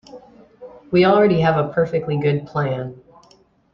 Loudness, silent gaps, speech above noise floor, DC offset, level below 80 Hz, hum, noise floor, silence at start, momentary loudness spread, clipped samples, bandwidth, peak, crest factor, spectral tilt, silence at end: -18 LUFS; none; 37 dB; under 0.1%; -52 dBFS; none; -54 dBFS; 0.15 s; 10 LU; under 0.1%; 6.6 kHz; -4 dBFS; 16 dB; -8.5 dB/octave; 0.8 s